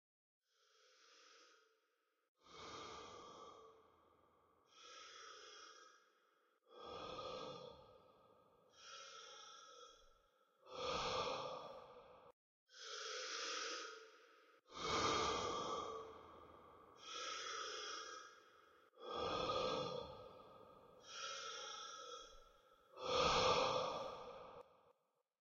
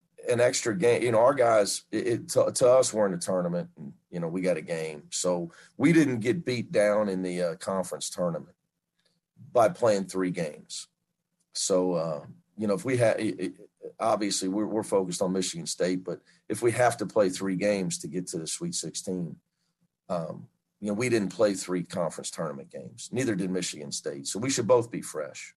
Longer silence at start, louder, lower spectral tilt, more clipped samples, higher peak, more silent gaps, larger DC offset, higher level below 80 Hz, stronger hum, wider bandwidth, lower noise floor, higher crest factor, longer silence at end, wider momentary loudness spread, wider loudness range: first, 1 s vs 0.2 s; second, -45 LUFS vs -27 LUFS; second, -1 dB/octave vs -4.5 dB/octave; neither; second, -26 dBFS vs -10 dBFS; first, 2.28-2.35 s, 12.33-12.67 s vs none; neither; about the same, -70 dBFS vs -70 dBFS; neither; second, 7.6 kHz vs 12.5 kHz; first, -85 dBFS vs -79 dBFS; about the same, 22 dB vs 18 dB; first, 0.7 s vs 0.05 s; first, 24 LU vs 14 LU; first, 17 LU vs 6 LU